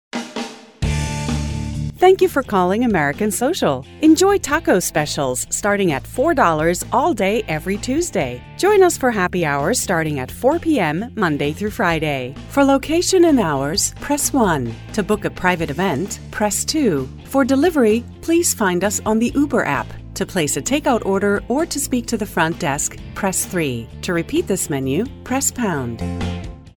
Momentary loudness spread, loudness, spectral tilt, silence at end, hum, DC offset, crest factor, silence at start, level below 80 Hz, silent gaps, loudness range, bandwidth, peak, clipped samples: 9 LU; -18 LUFS; -4.5 dB/octave; 0.05 s; none; under 0.1%; 18 dB; 0.15 s; -38 dBFS; none; 4 LU; over 20 kHz; 0 dBFS; under 0.1%